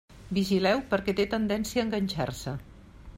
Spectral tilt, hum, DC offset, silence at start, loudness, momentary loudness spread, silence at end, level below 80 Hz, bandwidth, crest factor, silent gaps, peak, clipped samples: -5.5 dB/octave; none; under 0.1%; 0.1 s; -28 LUFS; 10 LU; 0 s; -50 dBFS; 16 kHz; 16 dB; none; -12 dBFS; under 0.1%